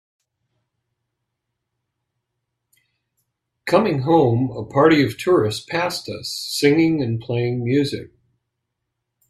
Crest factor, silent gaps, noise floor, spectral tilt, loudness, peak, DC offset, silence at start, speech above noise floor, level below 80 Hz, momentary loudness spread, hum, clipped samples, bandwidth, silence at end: 22 dB; none; -79 dBFS; -6 dB/octave; -19 LUFS; 0 dBFS; under 0.1%; 3.65 s; 60 dB; -58 dBFS; 11 LU; none; under 0.1%; 14.5 kHz; 1.25 s